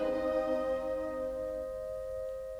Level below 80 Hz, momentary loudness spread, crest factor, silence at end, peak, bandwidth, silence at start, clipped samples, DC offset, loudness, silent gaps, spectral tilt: -54 dBFS; 7 LU; 12 dB; 0 s; -22 dBFS; 13 kHz; 0 s; under 0.1%; under 0.1%; -35 LUFS; none; -6 dB/octave